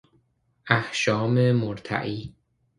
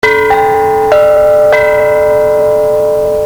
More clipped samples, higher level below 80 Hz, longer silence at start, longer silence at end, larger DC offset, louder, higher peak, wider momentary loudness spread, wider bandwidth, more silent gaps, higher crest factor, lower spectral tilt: neither; second, -58 dBFS vs -36 dBFS; first, 0.65 s vs 0.05 s; first, 0.5 s vs 0 s; neither; second, -24 LUFS vs -8 LUFS; about the same, -2 dBFS vs 0 dBFS; first, 12 LU vs 3 LU; second, 10.5 kHz vs over 20 kHz; neither; first, 24 dB vs 8 dB; first, -6 dB/octave vs -4.5 dB/octave